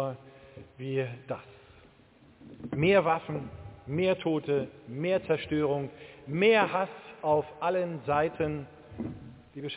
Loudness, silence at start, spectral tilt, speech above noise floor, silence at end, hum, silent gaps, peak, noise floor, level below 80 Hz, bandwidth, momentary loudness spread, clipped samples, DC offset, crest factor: -29 LUFS; 0 s; -10 dB/octave; 30 dB; 0 s; none; none; -10 dBFS; -58 dBFS; -58 dBFS; 4 kHz; 18 LU; under 0.1%; under 0.1%; 20 dB